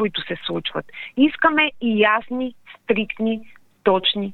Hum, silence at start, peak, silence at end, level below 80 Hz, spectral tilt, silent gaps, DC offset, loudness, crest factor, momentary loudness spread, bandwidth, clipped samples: none; 0 s; -2 dBFS; 0 s; -56 dBFS; -7 dB/octave; none; under 0.1%; -21 LUFS; 20 dB; 13 LU; 4.4 kHz; under 0.1%